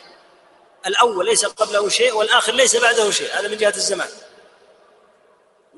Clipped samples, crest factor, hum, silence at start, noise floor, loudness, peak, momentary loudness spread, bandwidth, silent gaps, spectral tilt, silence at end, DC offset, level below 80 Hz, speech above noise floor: under 0.1%; 18 dB; none; 0.85 s; -56 dBFS; -17 LUFS; -2 dBFS; 9 LU; 11.5 kHz; none; 0 dB/octave; 1.5 s; under 0.1%; -68 dBFS; 38 dB